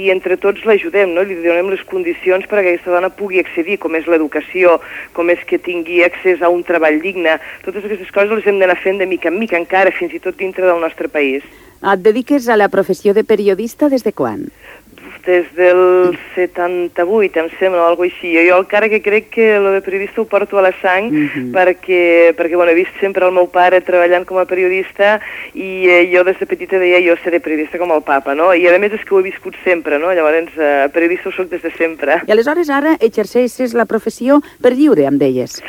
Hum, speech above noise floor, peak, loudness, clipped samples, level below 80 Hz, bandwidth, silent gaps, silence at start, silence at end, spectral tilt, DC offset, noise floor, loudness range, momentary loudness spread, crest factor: none; 24 dB; 0 dBFS; -13 LUFS; under 0.1%; -54 dBFS; 16.5 kHz; none; 0 s; 0 s; -5.5 dB/octave; under 0.1%; -37 dBFS; 3 LU; 8 LU; 12 dB